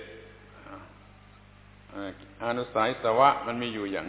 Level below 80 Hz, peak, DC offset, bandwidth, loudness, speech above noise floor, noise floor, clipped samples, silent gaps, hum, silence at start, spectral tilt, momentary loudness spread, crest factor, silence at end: -58 dBFS; -8 dBFS; under 0.1%; 4 kHz; -27 LUFS; 26 dB; -53 dBFS; under 0.1%; none; 50 Hz at -55 dBFS; 0 s; -3 dB/octave; 25 LU; 24 dB; 0 s